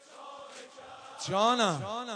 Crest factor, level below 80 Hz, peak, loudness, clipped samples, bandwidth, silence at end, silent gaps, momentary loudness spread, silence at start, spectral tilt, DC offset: 20 dB; -76 dBFS; -12 dBFS; -29 LUFS; under 0.1%; 10.5 kHz; 0 s; none; 22 LU; 0.1 s; -3.5 dB/octave; under 0.1%